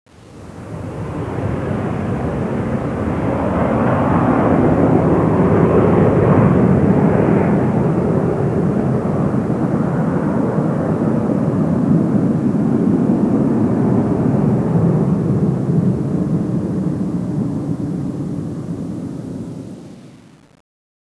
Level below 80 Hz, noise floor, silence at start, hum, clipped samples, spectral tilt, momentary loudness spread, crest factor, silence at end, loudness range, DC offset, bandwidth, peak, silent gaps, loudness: -38 dBFS; -42 dBFS; 0.25 s; none; under 0.1%; -10 dB/octave; 12 LU; 16 dB; 1 s; 9 LU; under 0.1%; 11 kHz; 0 dBFS; none; -16 LUFS